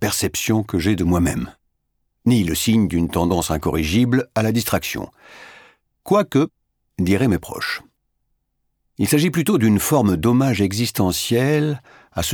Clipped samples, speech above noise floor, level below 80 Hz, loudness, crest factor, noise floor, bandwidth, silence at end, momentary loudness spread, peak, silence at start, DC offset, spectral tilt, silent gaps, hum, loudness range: under 0.1%; 53 dB; -40 dBFS; -19 LUFS; 16 dB; -71 dBFS; over 20 kHz; 0 s; 9 LU; -2 dBFS; 0 s; under 0.1%; -5.5 dB/octave; none; none; 4 LU